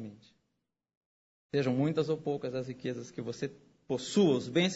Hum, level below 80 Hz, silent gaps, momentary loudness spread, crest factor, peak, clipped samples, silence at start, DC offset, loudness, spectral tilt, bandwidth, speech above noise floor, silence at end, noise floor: none; -72 dBFS; 0.97-1.49 s; 13 LU; 18 dB; -14 dBFS; under 0.1%; 0 s; under 0.1%; -32 LUFS; -6 dB/octave; 8 kHz; 53 dB; 0 s; -84 dBFS